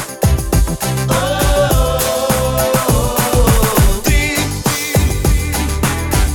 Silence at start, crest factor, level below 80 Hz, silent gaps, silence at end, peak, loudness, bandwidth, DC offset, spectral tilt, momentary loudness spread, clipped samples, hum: 0 s; 12 dB; -18 dBFS; none; 0 s; 0 dBFS; -14 LUFS; over 20 kHz; under 0.1%; -4.5 dB/octave; 4 LU; under 0.1%; none